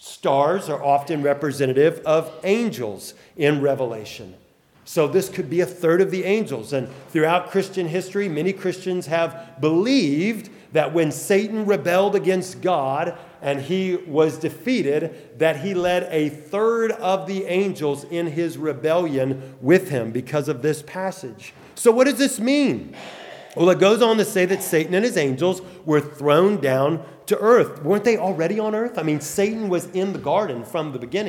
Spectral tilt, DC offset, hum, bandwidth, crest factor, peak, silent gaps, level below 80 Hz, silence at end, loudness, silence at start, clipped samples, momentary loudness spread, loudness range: -5.5 dB/octave; under 0.1%; none; 18 kHz; 18 dB; -2 dBFS; none; -66 dBFS; 0 s; -21 LUFS; 0.05 s; under 0.1%; 9 LU; 4 LU